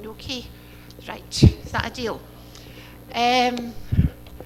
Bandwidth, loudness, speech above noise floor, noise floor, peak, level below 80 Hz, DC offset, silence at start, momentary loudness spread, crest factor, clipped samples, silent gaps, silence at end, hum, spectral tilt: 16 kHz; -23 LUFS; 20 dB; -42 dBFS; 0 dBFS; -34 dBFS; under 0.1%; 0 s; 25 LU; 24 dB; under 0.1%; none; 0 s; 60 Hz at -45 dBFS; -5.5 dB/octave